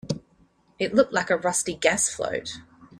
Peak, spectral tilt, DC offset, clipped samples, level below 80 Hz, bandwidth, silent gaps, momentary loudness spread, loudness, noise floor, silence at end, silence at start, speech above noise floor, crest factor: -4 dBFS; -3 dB/octave; under 0.1%; under 0.1%; -58 dBFS; 14.5 kHz; none; 12 LU; -24 LUFS; -61 dBFS; 0 s; 0.05 s; 37 dB; 22 dB